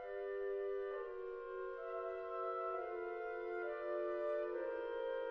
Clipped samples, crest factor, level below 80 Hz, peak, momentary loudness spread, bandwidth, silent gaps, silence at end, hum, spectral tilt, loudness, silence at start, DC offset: under 0.1%; 12 dB; -74 dBFS; -30 dBFS; 5 LU; 5.8 kHz; none; 0 s; none; -2 dB/octave; -43 LUFS; 0 s; under 0.1%